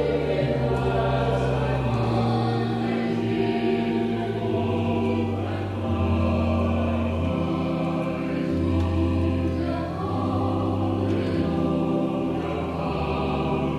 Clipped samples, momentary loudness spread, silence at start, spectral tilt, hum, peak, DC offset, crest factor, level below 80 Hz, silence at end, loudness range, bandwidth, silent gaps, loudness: under 0.1%; 4 LU; 0 s; -8.5 dB/octave; none; -12 dBFS; under 0.1%; 12 dB; -38 dBFS; 0 s; 1 LU; 10.5 kHz; none; -25 LUFS